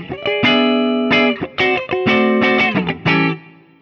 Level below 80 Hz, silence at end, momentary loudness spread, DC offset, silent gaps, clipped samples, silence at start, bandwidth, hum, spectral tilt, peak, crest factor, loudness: -50 dBFS; 0.4 s; 5 LU; under 0.1%; none; under 0.1%; 0 s; 6.8 kHz; none; -6.5 dB/octave; -4 dBFS; 12 dB; -15 LUFS